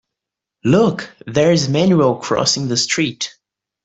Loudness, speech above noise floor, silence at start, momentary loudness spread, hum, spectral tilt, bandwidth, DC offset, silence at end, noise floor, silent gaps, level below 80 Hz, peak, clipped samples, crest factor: -16 LUFS; 68 dB; 0.65 s; 10 LU; none; -4.5 dB/octave; 8.4 kHz; under 0.1%; 0.55 s; -83 dBFS; none; -54 dBFS; -2 dBFS; under 0.1%; 14 dB